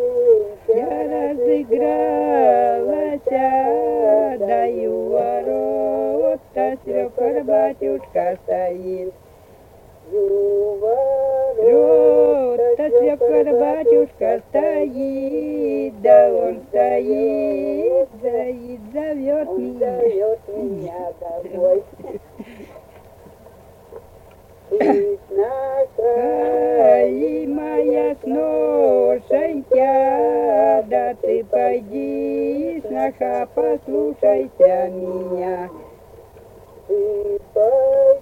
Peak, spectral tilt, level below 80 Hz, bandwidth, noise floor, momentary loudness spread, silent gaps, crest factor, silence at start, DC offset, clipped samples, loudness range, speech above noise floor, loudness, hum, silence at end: -2 dBFS; -8 dB/octave; -54 dBFS; 4.6 kHz; -46 dBFS; 10 LU; none; 16 dB; 0 s; under 0.1%; under 0.1%; 7 LU; 28 dB; -18 LUFS; none; 0 s